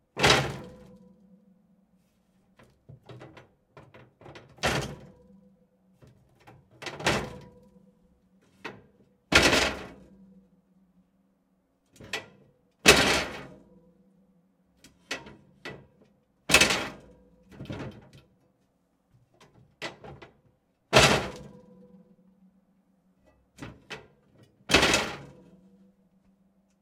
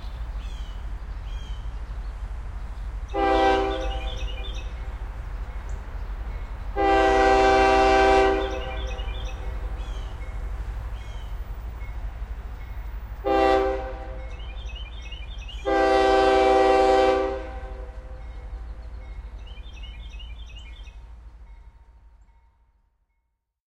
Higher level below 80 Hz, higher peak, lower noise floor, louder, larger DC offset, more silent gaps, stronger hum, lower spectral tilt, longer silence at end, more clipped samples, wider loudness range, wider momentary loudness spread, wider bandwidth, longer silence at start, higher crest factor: second, -50 dBFS vs -34 dBFS; first, -2 dBFS vs -6 dBFS; second, -71 dBFS vs -76 dBFS; about the same, -24 LUFS vs -22 LUFS; neither; neither; neither; second, -2.5 dB/octave vs -5.5 dB/octave; second, 1.55 s vs 1.7 s; neither; second, 17 LU vs 20 LU; first, 27 LU vs 22 LU; first, 16 kHz vs 14.5 kHz; first, 0.15 s vs 0 s; first, 28 dB vs 20 dB